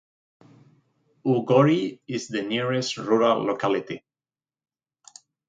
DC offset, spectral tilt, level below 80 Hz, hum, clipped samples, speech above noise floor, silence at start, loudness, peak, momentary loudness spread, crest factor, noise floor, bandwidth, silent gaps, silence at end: under 0.1%; -6 dB/octave; -70 dBFS; none; under 0.1%; over 67 dB; 1.25 s; -23 LUFS; -6 dBFS; 12 LU; 20 dB; under -90 dBFS; 9.2 kHz; none; 1.5 s